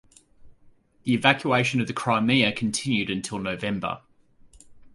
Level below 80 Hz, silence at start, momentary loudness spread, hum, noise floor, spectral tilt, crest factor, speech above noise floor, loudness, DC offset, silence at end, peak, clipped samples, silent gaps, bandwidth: -58 dBFS; 0.45 s; 10 LU; none; -56 dBFS; -4.5 dB/octave; 24 dB; 32 dB; -24 LUFS; under 0.1%; 0.05 s; -2 dBFS; under 0.1%; none; 11.5 kHz